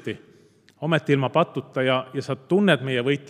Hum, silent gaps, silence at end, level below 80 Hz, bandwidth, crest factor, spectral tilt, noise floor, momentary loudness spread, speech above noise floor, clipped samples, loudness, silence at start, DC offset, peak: none; none; 0.05 s; -72 dBFS; 12.5 kHz; 20 dB; -6.5 dB/octave; -55 dBFS; 12 LU; 33 dB; under 0.1%; -23 LUFS; 0.05 s; under 0.1%; -4 dBFS